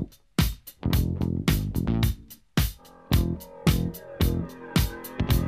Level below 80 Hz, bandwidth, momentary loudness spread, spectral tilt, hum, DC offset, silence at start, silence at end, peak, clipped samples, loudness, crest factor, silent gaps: -32 dBFS; 15.5 kHz; 6 LU; -5.5 dB/octave; none; under 0.1%; 0 s; 0 s; -8 dBFS; under 0.1%; -27 LUFS; 18 dB; none